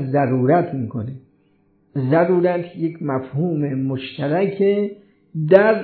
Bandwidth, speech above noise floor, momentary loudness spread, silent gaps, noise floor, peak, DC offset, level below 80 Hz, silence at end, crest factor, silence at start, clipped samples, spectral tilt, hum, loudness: 4.5 kHz; 41 dB; 12 LU; none; -59 dBFS; 0 dBFS; under 0.1%; -64 dBFS; 0 s; 20 dB; 0 s; under 0.1%; -11.5 dB/octave; none; -20 LUFS